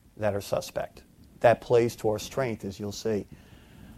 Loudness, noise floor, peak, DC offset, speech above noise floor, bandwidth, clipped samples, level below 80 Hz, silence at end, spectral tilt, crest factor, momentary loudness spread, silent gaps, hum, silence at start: -28 LUFS; -50 dBFS; -6 dBFS; under 0.1%; 23 dB; 15.5 kHz; under 0.1%; -56 dBFS; 0.05 s; -5.5 dB/octave; 22 dB; 12 LU; none; none; 0.2 s